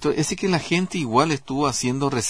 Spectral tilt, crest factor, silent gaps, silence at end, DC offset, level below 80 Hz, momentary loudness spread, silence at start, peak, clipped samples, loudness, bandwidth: -4.5 dB/octave; 18 dB; none; 0 s; 0.4%; -50 dBFS; 3 LU; 0 s; -4 dBFS; under 0.1%; -22 LUFS; 11 kHz